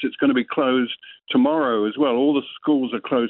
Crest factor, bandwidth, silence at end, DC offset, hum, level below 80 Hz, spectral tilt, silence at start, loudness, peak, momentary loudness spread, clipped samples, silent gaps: 14 dB; 4.1 kHz; 0 s; under 0.1%; none; -68 dBFS; -9 dB/octave; 0 s; -21 LUFS; -6 dBFS; 5 LU; under 0.1%; none